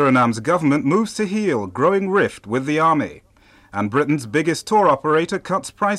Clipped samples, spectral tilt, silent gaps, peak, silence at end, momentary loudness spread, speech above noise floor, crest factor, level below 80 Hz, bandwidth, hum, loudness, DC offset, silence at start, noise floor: under 0.1%; -6 dB/octave; none; -6 dBFS; 0 s; 7 LU; 30 dB; 12 dB; -58 dBFS; 13.5 kHz; none; -19 LUFS; under 0.1%; 0 s; -48 dBFS